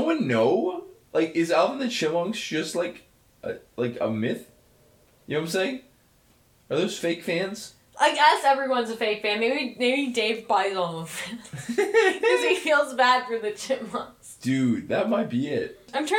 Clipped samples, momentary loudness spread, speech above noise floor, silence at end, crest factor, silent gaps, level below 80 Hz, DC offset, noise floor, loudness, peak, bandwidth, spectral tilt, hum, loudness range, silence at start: under 0.1%; 13 LU; 36 dB; 0 s; 20 dB; none; -68 dBFS; under 0.1%; -60 dBFS; -25 LUFS; -6 dBFS; 17.5 kHz; -4 dB/octave; none; 8 LU; 0 s